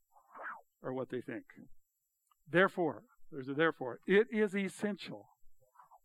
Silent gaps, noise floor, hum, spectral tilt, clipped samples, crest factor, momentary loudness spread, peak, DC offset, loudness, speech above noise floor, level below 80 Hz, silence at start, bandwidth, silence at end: none; -81 dBFS; none; -6 dB/octave; under 0.1%; 22 dB; 18 LU; -14 dBFS; under 0.1%; -34 LUFS; 47 dB; -76 dBFS; 0.35 s; 12.5 kHz; 0.5 s